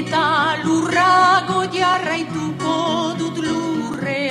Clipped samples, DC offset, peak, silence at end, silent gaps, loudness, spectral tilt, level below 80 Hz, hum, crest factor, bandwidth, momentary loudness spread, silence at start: under 0.1%; under 0.1%; -4 dBFS; 0 s; none; -18 LUFS; -4.5 dB/octave; -54 dBFS; none; 16 dB; 13 kHz; 9 LU; 0 s